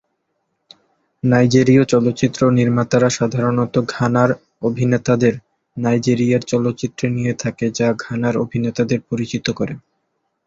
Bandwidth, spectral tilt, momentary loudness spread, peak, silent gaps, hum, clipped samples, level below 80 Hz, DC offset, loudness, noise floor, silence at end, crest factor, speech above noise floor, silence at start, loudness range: 7.8 kHz; -6.5 dB/octave; 9 LU; 0 dBFS; none; none; under 0.1%; -52 dBFS; under 0.1%; -17 LUFS; -71 dBFS; 0.65 s; 16 dB; 54 dB; 1.25 s; 5 LU